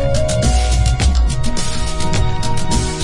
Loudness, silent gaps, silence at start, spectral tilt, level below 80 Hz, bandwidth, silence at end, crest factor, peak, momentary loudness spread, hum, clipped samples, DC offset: -17 LUFS; none; 0 s; -4.5 dB/octave; -18 dBFS; 11.5 kHz; 0 s; 12 dB; -2 dBFS; 6 LU; none; under 0.1%; under 0.1%